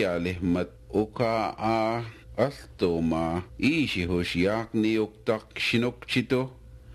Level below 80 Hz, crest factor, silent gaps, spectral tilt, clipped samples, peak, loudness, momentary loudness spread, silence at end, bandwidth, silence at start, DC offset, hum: -50 dBFS; 18 dB; none; -6 dB/octave; under 0.1%; -10 dBFS; -27 LUFS; 5 LU; 0 s; 13.5 kHz; 0 s; under 0.1%; none